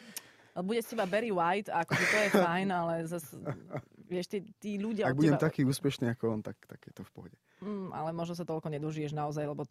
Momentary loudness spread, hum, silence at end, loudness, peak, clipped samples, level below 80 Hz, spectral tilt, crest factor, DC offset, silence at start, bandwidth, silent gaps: 18 LU; none; 0.05 s; -32 LUFS; -10 dBFS; under 0.1%; -70 dBFS; -6 dB/octave; 22 dB; under 0.1%; 0 s; 15.5 kHz; none